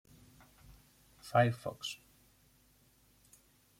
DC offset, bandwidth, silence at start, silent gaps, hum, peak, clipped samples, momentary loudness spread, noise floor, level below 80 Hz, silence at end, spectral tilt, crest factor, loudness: under 0.1%; 16.5 kHz; 1.25 s; none; none; -14 dBFS; under 0.1%; 20 LU; -68 dBFS; -68 dBFS; 1.85 s; -5.5 dB/octave; 26 dB; -34 LUFS